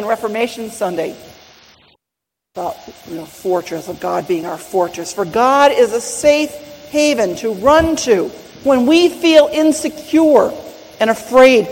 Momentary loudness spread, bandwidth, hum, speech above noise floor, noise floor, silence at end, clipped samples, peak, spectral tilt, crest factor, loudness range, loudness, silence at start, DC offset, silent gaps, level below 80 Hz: 16 LU; 16.5 kHz; none; 68 dB; -82 dBFS; 0 s; 0.1%; 0 dBFS; -4 dB/octave; 14 dB; 12 LU; -14 LUFS; 0 s; under 0.1%; none; -44 dBFS